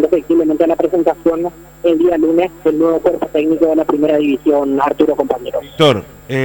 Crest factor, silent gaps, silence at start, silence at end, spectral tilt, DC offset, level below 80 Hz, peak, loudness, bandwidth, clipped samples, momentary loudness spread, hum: 14 dB; none; 0 s; 0 s; -6.5 dB/octave; under 0.1%; -46 dBFS; 0 dBFS; -14 LUFS; 18.5 kHz; under 0.1%; 6 LU; none